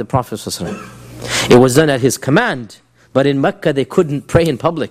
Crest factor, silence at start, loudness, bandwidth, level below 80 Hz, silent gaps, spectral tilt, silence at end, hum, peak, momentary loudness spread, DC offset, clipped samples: 14 dB; 0 s; -14 LUFS; 16 kHz; -40 dBFS; none; -5 dB/octave; 0 s; none; 0 dBFS; 16 LU; under 0.1%; 0.2%